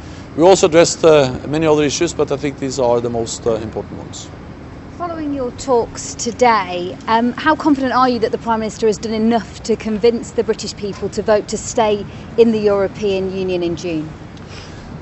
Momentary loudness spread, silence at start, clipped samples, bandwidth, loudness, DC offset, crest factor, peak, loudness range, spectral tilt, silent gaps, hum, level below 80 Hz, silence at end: 18 LU; 0 s; under 0.1%; 8.4 kHz; -16 LUFS; under 0.1%; 16 dB; 0 dBFS; 6 LU; -4.5 dB/octave; none; none; -42 dBFS; 0 s